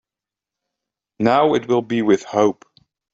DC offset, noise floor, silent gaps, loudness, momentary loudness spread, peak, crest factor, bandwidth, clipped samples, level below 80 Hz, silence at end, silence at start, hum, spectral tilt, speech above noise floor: under 0.1%; -88 dBFS; none; -18 LUFS; 5 LU; -2 dBFS; 18 dB; 8 kHz; under 0.1%; -62 dBFS; 0.6 s; 1.2 s; none; -6 dB/octave; 71 dB